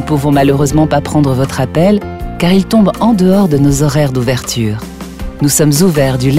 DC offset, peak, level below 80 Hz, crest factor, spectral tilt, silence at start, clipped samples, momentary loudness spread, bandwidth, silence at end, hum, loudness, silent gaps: 2%; 0 dBFS; -30 dBFS; 10 dB; -6 dB/octave; 0 s; under 0.1%; 7 LU; 16.5 kHz; 0 s; none; -11 LUFS; none